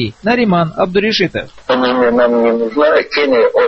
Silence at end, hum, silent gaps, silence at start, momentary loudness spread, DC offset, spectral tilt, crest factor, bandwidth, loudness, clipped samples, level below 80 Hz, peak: 0 s; none; none; 0 s; 4 LU; under 0.1%; -6.5 dB/octave; 12 dB; 6.4 kHz; -13 LUFS; under 0.1%; -46 dBFS; 0 dBFS